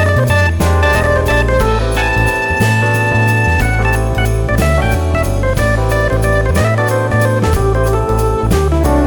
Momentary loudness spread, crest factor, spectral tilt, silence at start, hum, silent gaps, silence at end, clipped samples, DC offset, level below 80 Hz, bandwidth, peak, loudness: 3 LU; 10 dB; -6 dB/octave; 0 s; none; none; 0 s; under 0.1%; under 0.1%; -18 dBFS; 19.5 kHz; -2 dBFS; -13 LUFS